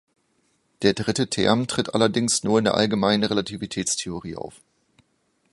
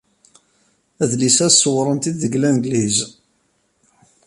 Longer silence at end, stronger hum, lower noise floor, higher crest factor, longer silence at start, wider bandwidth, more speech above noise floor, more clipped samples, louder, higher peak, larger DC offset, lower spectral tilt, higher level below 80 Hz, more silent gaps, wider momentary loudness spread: second, 1.05 s vs 1.2 s; neither; first, -68 dBFS vs -64 dBFS; about the same, 22 dB vs 18 dB; second, 0.8 s vs 1 s; about the same, 11.5 kHz vs 11.5 kHz; about the same, 46 dB vs 48 dB; neither; second, -22 LUFS vs -16 LUFS; about the same, -2 dBFS vs -2 dBFS; neither; about the same, -4 dB/octave vs -3.5 dB/octave; about the same, -54 dBFS vs -58 dBFS; neither; about the same, 12 LU vs 10 LU